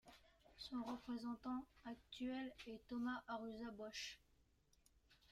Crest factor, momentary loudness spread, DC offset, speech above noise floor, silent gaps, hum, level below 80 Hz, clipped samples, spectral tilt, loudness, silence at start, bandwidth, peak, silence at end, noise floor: 16 dB; 10 LU; under 0.1%; 28 dB; none; none; -74 dBFS; under 0.1%; -4 dB/octave; -50 LUFS; 0.05 s; 14.5 kHz; -36 dBFS; 0 s; -77 dBFS